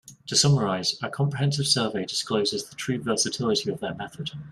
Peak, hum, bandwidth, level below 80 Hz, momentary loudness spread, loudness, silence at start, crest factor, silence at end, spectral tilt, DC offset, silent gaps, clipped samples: -8 dBFS; none; 13.5 kHz; -60 dBFS; 11 LU; -25 LUFS; 0.05 s; 18 dB; 0 s; -4 dB/octave; under 0.1%; none; under 0.1%